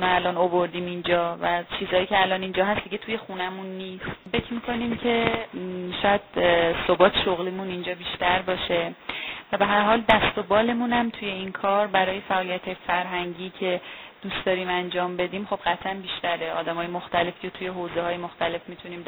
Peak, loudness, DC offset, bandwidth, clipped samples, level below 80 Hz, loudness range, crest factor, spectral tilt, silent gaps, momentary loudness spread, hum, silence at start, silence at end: 0 dBFS; -25 LUFS; under 0.1%; over 20 kHz; under 0.1%; -52 dBFS; 5 LU; 26 dB; -7.5 dB/octave; none; 11 LU; none; 0 s; 0 s